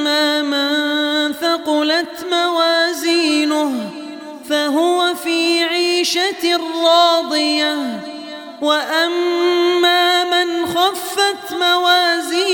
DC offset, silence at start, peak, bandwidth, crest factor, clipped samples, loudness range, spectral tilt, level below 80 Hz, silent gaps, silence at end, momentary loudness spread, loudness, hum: under 0.1%; 0 s; 0 dBFS; over 20 kHz; 16 dB; under 0.1%; 2 LU; -1.5 dB/octave; -68 dBFS; none; 0 s; 9 LU; -15 LUFS; none